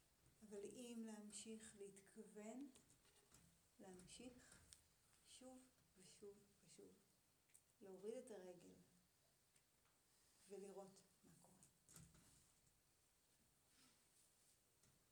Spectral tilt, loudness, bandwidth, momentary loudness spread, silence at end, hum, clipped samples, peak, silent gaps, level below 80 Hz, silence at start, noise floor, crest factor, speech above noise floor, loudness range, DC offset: -4 dB/octave; -61 LUFS; over 20 kHz; 12 LU; 0 s; none; under 0.1%; -42 dBFS; none; -88 dBFS; 0 s; -82 dBFS; 22 dB; 21 dB; 8 LU; under 0.1%